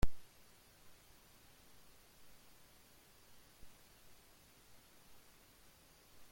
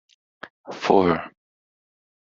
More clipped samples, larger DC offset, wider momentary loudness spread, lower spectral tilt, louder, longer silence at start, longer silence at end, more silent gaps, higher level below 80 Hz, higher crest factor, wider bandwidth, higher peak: neither; neither; second, 1 LU vs 25 LU; about the same, -5 dB/octave vs -4.5 dB/octave; second, -61 LUFS vs -21 LUFS; second, 0 s vs 0.45 s; second, 0.65 s vs 0.95 s; second, none vs 0.50-0.64 s; first, -54 dBFS vs -60 dBFS; about the same, 24 dB vs 22 dB; first, 16.5 kHz vs 7.6 kHz; second, -20 dBFS vs -2 dBFS